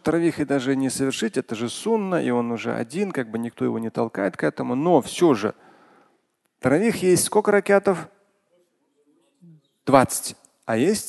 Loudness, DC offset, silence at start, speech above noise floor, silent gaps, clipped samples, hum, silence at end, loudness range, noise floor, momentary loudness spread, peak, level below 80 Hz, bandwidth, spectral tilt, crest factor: -22 LUFS; under 0.1%; 0.05 s; 48 dB; none; under 0.1%; none; 0 s; 4 LU; -69 dBFS; 9 LU; 0 dBFS; -58 dBFS; 12.5 kHz; -5 dB/octave; 22 dB